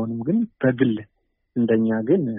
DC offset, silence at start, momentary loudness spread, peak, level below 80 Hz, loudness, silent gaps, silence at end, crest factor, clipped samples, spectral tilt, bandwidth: under 0.1%; 0 s; 7 LU; -6 dBFS; -60 dBFS; -22 LUFS; none; 0 s; 16 dB; under 0.1%; -7.5 dB/octave; 3.7 kHz